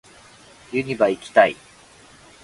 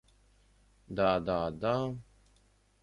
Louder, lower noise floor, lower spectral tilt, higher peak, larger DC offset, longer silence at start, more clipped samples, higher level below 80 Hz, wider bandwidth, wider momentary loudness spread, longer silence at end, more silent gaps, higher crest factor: first, -20 LUFS vs -32 LUFS; second, -49 dBFS vs -67 dBFS; second, -5 dB/octave vs -7.5 dB/octave; first, 0 dBFS vs -14 dBFS; neither; second, 0.7 s vs 0.9 s; neither; about the same, -60 dBFS vs -58 dBFS; about the same, 11.5 kHz vs 11 kHz; about the same, 11 LU vs 12 LU; about the same, 0.9 s vs 0.8 s; neither; about the same, 24 dB vs 20 dB